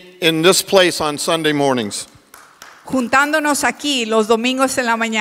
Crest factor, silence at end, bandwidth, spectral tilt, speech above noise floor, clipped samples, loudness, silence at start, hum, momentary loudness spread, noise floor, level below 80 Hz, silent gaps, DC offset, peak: 16 dB; 0 s; 16.5 kHz; -3 dB/octave; 29 dB; under 0.1%; -16 LUFS; 0.05 s; none; 9 LU; -45 dBFS; -56 dBFS; none; under 0.1%; 0 dBFS